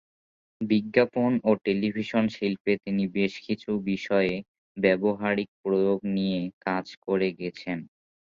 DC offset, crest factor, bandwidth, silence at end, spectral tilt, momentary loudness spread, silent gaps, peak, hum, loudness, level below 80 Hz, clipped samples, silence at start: under 0.1%; 20 dB; 7.2 kHz; 0.45 s; -7.5 dB/octave; 9 LU; 2.60-2.65 s, 4.48-4.75 s, 5.48-5.64 s, 6.53-6.61 s, 6.97-7.02 s; -6 dBFS; none; -27 LUFS; -62 dBFS; under 0.1%; 0.6 s